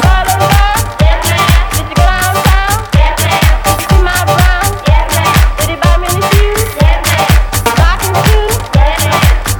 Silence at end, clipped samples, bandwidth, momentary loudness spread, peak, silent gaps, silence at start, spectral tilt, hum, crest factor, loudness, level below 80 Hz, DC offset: 0 s; 1%; over 20 kHz; 3 LU; 0 dBFS; none; 0 s; -4.5 dB/octave; none; 8 dB; -10 LUFS; -12 dBFS; under 0.1%